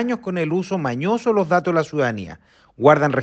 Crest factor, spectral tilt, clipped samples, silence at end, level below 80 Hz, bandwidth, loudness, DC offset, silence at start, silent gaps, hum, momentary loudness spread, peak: 20 dB; -7 dB/octave; under 0.1%; 0 s; -60 dBFS; 8.4 kHz; -19 LUFS; under 0.1%; 0 s; none; none; 8 LU; 0 dBFS